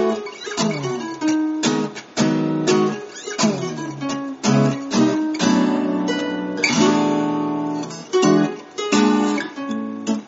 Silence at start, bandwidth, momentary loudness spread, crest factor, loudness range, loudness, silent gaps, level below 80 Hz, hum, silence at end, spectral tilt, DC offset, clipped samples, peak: 0 s; 8 kHz; 10 LU; 16 dB; 2 LU; -20 LUFS; none; -62 dBFS; none; 0 s; -4.5 dB/octave; under 0.1%; under 0.1%; -4 dBFS